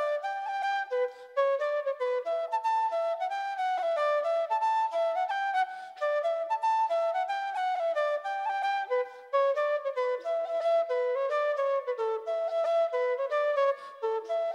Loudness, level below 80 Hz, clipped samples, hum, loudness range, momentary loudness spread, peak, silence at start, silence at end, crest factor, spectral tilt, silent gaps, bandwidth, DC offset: -29 LUFS; under -90 dBFS; under 0.1%; none; 1 LU; 5 LU; -16 dBFS; 0 s; 0 s; 12 dB; 0.5 dB/octave; none; 11.5 kHz; under 0.1%